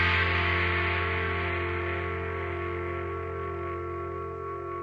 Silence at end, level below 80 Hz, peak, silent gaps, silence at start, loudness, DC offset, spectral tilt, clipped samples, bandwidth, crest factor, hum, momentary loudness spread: 0 s; -44 dBFS; -14 dBFS; none; 0 s; -29 LUFS; under 0.1%; -7 dB/octave; under 0.1%; 6 kHz; 16 dB; none; 10 LU